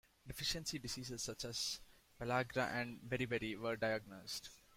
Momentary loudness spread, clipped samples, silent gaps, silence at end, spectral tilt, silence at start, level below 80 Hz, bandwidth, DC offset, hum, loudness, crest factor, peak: 8 LU; under 0.1%; none; 0.2 s; -3.5 dB/octave; 0.25 s; -64 dBFS; 16.5 kHz; under 0.1%; none; -42 LUFS; 20 dB; -24 dBFS